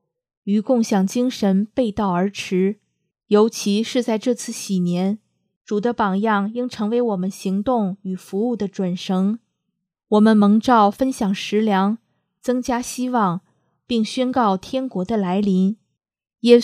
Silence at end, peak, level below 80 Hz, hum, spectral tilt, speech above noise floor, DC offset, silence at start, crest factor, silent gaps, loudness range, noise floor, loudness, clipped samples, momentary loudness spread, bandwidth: 0 s; 0 dBFS; -56 dBFS; none; -6 dB/octave; 58 dB; under 0.1%; 0.45 s; 20 dB; 5.56-5.65 s; 4 LU; -77 dBFS; -20 LUFS; under 0.1%; 9 LU; 14 kHz